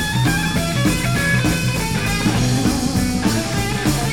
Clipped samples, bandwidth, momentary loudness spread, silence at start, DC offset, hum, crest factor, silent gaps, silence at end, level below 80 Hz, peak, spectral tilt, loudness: under 0.1%; 19 kHz; 3 LU; 0 s; 0.8%; none; 14 dB; none; 0 s; -30 dBFS; -4 dBFS; -4.5 dB/octave; -18 LUFS